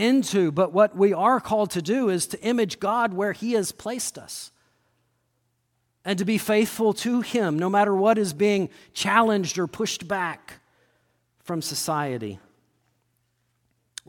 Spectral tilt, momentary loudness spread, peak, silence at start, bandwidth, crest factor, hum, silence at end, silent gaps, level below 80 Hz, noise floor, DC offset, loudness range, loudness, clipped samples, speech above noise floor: -4.5 dB/octave; 12 LU; -4 dBFS; 0 s; 17.5 kHz; 20 dB; none; 1.7 s; none; -66 dBFS; -73 dBFS; under 0.1%; 9 LU; -23 LUFS; under 0.1%; 50 dB